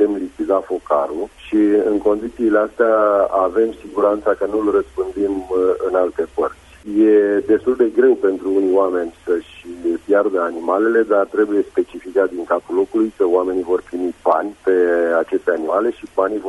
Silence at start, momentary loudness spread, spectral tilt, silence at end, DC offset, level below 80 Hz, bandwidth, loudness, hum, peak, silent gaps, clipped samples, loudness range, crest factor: 0 s; 8 LU; -6.5 dB/octave; 0 s; under 0.1%; -50 dBFS; 11.5 kHz; -18 LUFS; none; -2 dBFS; none; under 0.1%; 2 LU; 14 dB